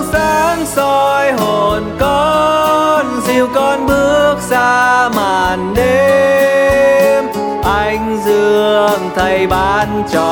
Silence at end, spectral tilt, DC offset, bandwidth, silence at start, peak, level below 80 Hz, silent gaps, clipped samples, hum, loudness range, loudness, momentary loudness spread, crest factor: 0 s; -4.5 dB/octave; under 0.1%; 19 kHz; 0 s; 0 dBFS; -32 dBFS; none; under 0.1%; none; 1 LU; -12 LUFS; 5 LU; 12 dB